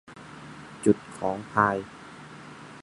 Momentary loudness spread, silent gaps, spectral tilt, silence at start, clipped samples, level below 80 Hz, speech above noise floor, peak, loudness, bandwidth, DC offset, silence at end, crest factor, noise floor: 20 LU; none; -6 dB/octave; 0.1 s; under 0.1%; -60 dBFS; 19 dB; -4 dBFS; -26 LUFS; 11.5 kHz; under 0.1%; 0 s; 24 dB; -45 dBFS